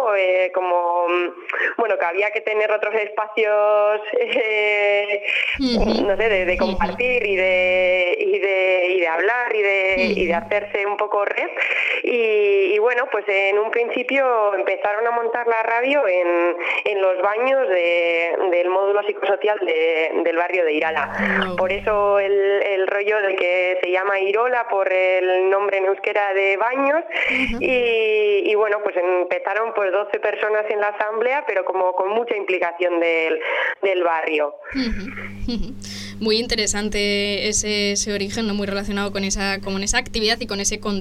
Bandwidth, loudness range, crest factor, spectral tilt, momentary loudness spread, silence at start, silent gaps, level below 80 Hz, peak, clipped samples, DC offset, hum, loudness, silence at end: 13.5 kHz; 3 LU; 16 dB; -3 dB/octave; 5 LU; 0 s; none; -40 dBFS; -4 dBFS; under 0.1%; under 0.1%; none; -19 LUFS; 0 s